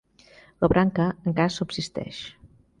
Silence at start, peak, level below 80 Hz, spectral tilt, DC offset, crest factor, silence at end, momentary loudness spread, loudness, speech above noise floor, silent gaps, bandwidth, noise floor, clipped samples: 0.6 s; -8 dBFS; -46 dBFS; -6.5 dB/octave; under 0.1%; 18 dB; 0.35 s; 15 LU; -25 LUFS; 30 dB; none; 10 kHz; -54 dBFS; under 0.1%